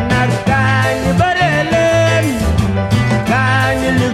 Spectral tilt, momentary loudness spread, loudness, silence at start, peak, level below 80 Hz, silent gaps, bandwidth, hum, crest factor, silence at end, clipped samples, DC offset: -6 dB/octave; 3 LU; -13 LUFS; 0 s; 0 dBFS; -28 dBFS; none; 14.5 kHz; none; 12 dB; 0 s; under 0.1%; under 0.1%